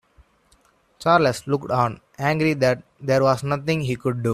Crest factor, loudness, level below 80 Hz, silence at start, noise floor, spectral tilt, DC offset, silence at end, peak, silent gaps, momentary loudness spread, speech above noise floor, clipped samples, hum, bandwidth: 20 dB; -22 LUFS; -56 dBFS; 1 s; -60 dBFS; -6.5 dB/octave; under 0.1%; 0 s; -2 dBFS; none; 7 LU; 39 dB; under 0.1%; none; 14.5 kHz